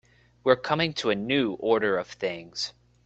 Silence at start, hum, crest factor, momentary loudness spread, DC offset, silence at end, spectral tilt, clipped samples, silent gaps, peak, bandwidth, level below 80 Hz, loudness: 0.45 s; 60 Hz at -55 dBFS; 22 dB; 9 LU; under 0.1%; 0.35 s; -5 dB/octave; under 0.1%; none; -6 dBFS; 8.2 kHz; -62 dBFS; -26 LUFS